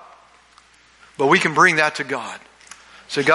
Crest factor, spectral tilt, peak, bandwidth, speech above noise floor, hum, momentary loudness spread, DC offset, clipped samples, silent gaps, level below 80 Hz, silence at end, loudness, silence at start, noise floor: 20 dB; -4 dB/octave; -2 dBFS; 11.5 kHz; 34 dB; none; 16 LU; under 0.1%; under 0.1%; none; -64 dBFS; 0 s; -17 LUFS; 1.2 s; -52 dBFS